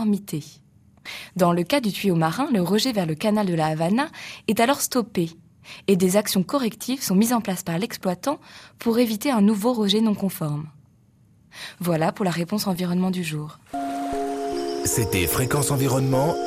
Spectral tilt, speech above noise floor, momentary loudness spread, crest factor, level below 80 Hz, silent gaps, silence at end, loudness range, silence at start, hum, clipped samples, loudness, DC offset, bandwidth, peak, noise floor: -5 dB/octave; 34 dB; 11 LU; 18 dB; -52 dBFS; none; 0 s; 4 LU; 0 s; none; under 0.1%; -23 LUFS; under 0.1%; 15.5 kHz; -6 dBFS; -56 dBFS